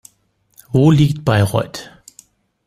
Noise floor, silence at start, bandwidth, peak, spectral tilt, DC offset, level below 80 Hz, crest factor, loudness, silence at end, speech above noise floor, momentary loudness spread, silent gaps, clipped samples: -61 dBFS; 0.75 s; 15.5 kHz; -2 dBFS; -7 dB/octave; under 0.1%; -46 dBFS; 16 dB; -15 LUFS; 0.85 s; 47 dB; 14 LU; none; under 0.1%